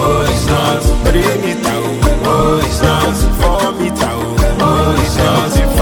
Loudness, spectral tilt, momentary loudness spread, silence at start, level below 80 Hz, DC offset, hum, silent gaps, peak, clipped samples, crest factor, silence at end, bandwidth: -13 LUFS; -5.5 dB/octave; 4 LU; 0 s; -18 dBFS; under 0.1%; none; none; 0 dBFS; under 0.1%; 12 dB; 0 s; 19 kHz